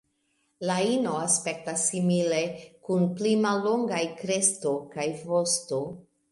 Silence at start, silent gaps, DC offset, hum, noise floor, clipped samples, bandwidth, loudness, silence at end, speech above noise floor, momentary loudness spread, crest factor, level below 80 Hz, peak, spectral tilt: 0.6 s; none; under 0.1%; none; -73 dBFS; under 0.1%; 11.5 kHz; -26 LUFS; 0.3 s; 46 dB; 8 LU; 20 dB; -72 dBFS; -8 dBFS; -4 dB/octave